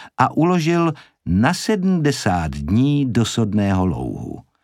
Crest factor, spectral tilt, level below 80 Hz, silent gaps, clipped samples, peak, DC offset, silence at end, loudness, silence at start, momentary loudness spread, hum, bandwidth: 18 dB; -6 dB/octave; -40 dBFS; none; under 0.1%; 0 dBFS; under 0.1%; 0.25 s; -19 LUFS; 0 s; 9 LU; none; 14.5 kHz